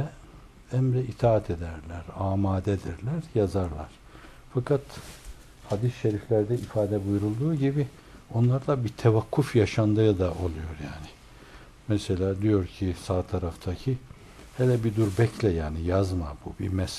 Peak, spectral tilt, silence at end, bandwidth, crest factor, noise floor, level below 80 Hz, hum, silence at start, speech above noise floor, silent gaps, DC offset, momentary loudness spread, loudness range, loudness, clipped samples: -8 dBFS; -8 dB/octave; 0 s; 13 kHz; 18 dB; -49 dBFS; -48 dBFS; none; 0 s; 23 dB; none; under 0.1%; 13 LU; 5 LU; -27 LUFS; under 0.1%